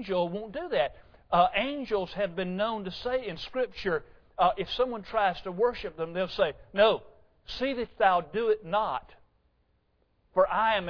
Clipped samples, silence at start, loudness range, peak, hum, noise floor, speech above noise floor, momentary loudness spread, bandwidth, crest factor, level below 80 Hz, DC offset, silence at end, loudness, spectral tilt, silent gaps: under 0.1%; 0 s; 2 LU; -10 dBFS; none; -70 dBFS; 42 dB; 9 LU; 5.4 kHz; 20 dB; -54 dBFS; under 0.1%; 0 s; -29 LUFS; -6.5 dB/octave; none